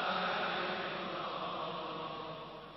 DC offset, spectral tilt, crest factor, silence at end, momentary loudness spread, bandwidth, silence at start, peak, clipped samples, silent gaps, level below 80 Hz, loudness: under 0.1%; -6 dB/octave; 14 dB; 0 s; 9 LU; 6 kHz; 0 s; -24 dBFS; under 0.1%; none; -70 dBFS; -38 LUFS